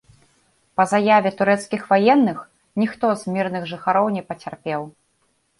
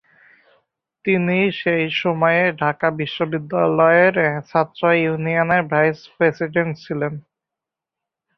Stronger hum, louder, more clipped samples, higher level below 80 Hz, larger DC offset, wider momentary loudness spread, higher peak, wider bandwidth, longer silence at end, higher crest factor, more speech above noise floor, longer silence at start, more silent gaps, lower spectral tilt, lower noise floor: neither; about the same, -20 LUFS vs -18 LUFS; neither; about the same, -64 dBFS vs -62 dBFS; neither; first, 14 LU vs 10 LU; about the same, -4 dBFS vs -2 dBFS; first, 11.5 kHz vs 6.2 kHz; second, 0.7 s vs 1.15 s; about the same, 18 dB vs 18 dB; second, 47 dB vs 67 dB; second, 0.8 s vs 1.05 s; neither; second, -6 dB/octave vs -8 dB/octave; second, -66 dBFS vs -86 dBFS